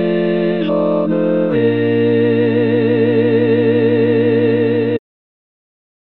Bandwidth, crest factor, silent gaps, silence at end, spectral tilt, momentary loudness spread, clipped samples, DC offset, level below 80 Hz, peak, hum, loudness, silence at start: 4.4 kHz; 12 dB; none; 1.2 s; -11 dB/octave; 3 LU; under 0.1%; 1%; -66 dBFS; -2 dBFS; none; -14 LUFS; 0 s